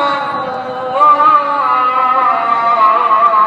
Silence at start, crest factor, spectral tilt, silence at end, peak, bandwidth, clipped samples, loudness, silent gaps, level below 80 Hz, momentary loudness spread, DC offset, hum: 0 s; 12 dB; -4.5 dB/octave; 0 s; 0 dBFS; 8 kHz; under 0.1%; -11 LUFS; none; -64 dBFS; 10 LU; under 0.1%; none